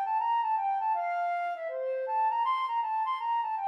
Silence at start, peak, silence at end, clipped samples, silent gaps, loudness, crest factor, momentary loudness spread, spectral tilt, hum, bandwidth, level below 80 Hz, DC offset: 0 s; -20 dBFS; 0 s; under 0.1%; none; -30 LUFS; 8 dB; 5 LU; 1.5 dB/octave; none; 6 kHz; under -90 dBFS; under 0.1%